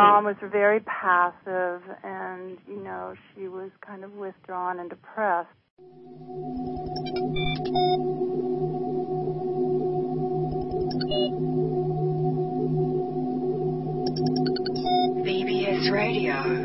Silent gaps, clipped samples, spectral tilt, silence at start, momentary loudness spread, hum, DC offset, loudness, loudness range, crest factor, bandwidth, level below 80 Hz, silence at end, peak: 5.71-5.77 s; under 0.1%; -9 dB/octave; 0 s; 14 LU; none; under 0.1%; -26 LUFS; 8 LU; 22 dB; 6 kHz; -52 dBFS; 0 s; -4 dBFS